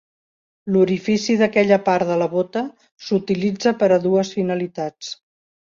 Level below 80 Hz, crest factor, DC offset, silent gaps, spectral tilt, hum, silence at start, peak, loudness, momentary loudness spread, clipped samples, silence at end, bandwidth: -62 dBFS; 18 dB; under 0.1%; 2.92-2.97 s; -6 dB/octave; none; 0.65 s; -2 dBFS; -19 LUFS; 16 LU; under 0.1%; 0.6 s; 7.6 kHz